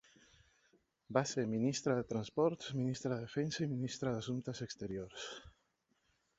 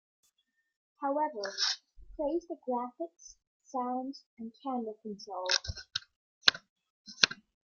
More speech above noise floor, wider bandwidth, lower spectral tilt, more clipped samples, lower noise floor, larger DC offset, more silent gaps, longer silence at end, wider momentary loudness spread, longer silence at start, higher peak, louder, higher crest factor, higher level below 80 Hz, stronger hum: about the same, 42 dB vs 43 dB; second, 8 kHz vs 15.5 kHz; first, -6 dB/octave vs -1.5 dB/octave; neither; about the same, -80 dBFS vs -78 dBFS; neither; second, none vs 3.47-3.60 s, 4.26-4.37 s, 6.16-6.41 s, 6.70-6.76 s, 6.90-7.05 s; first, 0.9 s vs 0.3 s; second, 9 LU vs 17 LU; about the same, 1.1 s vs 1 s; second, -16 dBFS vs 0 dBFS; second, -39 LUFS vs -33 LUFS; second, 24 dB vs 36 dB; second, -70 dBFS vs -62 dBFS; neither